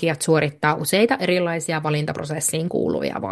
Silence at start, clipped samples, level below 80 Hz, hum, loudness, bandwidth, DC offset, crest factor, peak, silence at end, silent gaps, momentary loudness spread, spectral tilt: 0 s; under 0.1%; -58 dBFS; none; -21 LUFS; 12.5 kHz; under 0.1%; 18 dB; -2 dBFS; 0 s; none; 5 LU; -4.5 dB/octave